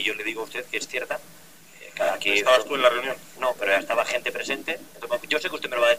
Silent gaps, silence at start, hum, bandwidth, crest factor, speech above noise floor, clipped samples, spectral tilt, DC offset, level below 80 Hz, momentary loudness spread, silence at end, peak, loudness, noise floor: none; 0 s; none; 16 kHz; 22 dB; 22 dB; under 0.1%; -1.5 dB/octave; 0.4%; -66 dBFS; 12 LU; 0 s; -4 dBFS; -24 LUFS; -47 dBFS